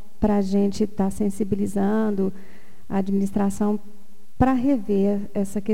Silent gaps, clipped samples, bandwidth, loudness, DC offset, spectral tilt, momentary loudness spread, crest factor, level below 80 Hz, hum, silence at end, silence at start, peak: none; under 0.1%; 14.5 kHz; -23 LUFS; 4%; -7.5 dB/octave; 6 LU; 18 dB; -42 dBFS; none; 0 s; 0.2 s; -6 dBFS